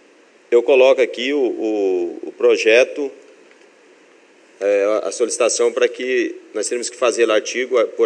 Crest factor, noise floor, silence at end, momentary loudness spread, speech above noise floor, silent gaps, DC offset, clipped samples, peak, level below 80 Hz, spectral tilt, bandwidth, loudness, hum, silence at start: 18 dB; -50 dBFS; 0 s; 10 LU; 33 dB; none; under 0.1%; under 0.1%; 0 dBFS; -84 dBFS; -1 dB/octave; 10.5 kHz; -17 LUFS; none; 0.5 s